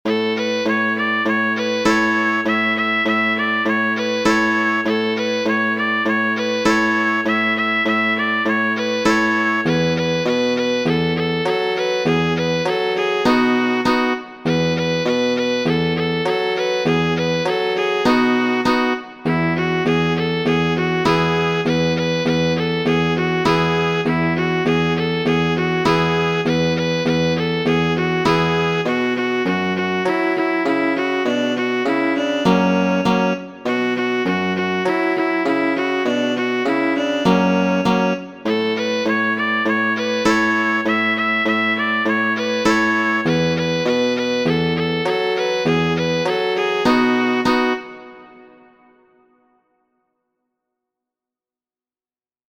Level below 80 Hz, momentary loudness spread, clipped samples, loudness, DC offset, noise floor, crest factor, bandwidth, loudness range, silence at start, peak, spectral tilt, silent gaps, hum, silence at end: -50 dBFS; 3 LU; under 0.1%; -18 LUFS; under 0.1%; under -90 dBFS; 16 dB; 19 kHz; 2 LU; 0.05 s; -2 dBFS; -5.5 dB/octave; none; none; 4.05 s